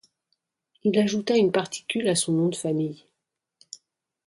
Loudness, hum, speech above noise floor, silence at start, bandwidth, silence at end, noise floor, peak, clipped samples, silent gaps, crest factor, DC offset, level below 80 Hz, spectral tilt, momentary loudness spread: -24 LUFS; none; 59 dB; 0.85 s; 11.5 kHz; 1.3 s; -83 dBFS; -10 dBFS; under 0.1%; none; 16 dB; under 0.1%; -70 dBFS; -4.5 dB/octave; 23 LU